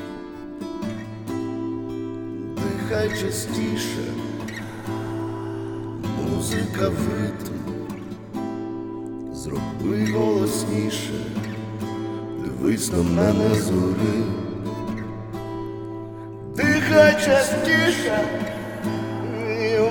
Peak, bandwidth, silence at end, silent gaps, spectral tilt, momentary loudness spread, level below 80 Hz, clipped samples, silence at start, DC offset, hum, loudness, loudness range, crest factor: -2 dBFS; 19 kHz; 0 s; none; -5.5 dB/octave; 14 LU; -48 dBFS; under 0.1%; 0 s; under 0.1%; none; -24 LUFS; 8 LU; 22 dB